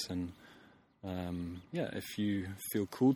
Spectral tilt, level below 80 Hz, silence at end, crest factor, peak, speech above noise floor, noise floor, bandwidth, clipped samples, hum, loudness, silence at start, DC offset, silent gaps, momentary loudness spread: -6 dB/octave; -64 dBFS; 0 s; 18 dB; -18 dBFS; 26 dB; -62 dBFS; over 20 kHz; under 0.1%; none; -38 LUFS; 0 s; under 0.1%; none; 11 LU